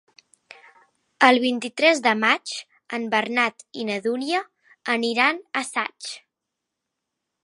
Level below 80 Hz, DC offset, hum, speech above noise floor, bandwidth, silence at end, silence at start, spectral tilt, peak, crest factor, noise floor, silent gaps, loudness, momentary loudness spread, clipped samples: -80 dBFS; under 0.1%; none; 61 dB; 11.5 kHz; 1.25 s; 1.2 s; -2.5 dB/octave; 0 dBFS; 24 dB; -83 dBFS; none; -22 LUFS; 15 LU; under 0.1%